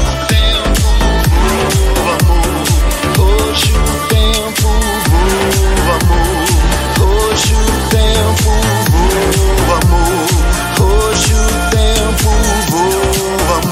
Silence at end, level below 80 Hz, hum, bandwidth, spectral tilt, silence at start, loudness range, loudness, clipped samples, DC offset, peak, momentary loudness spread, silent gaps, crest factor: 0 s; -14 dBFS; none; 16.5 kHz; -4 dB/octave; 0 s; 1 LU; -12 LUFS; under 0.1%; under 0.1%; 0 dBFS; 2 LU; none; 10 dB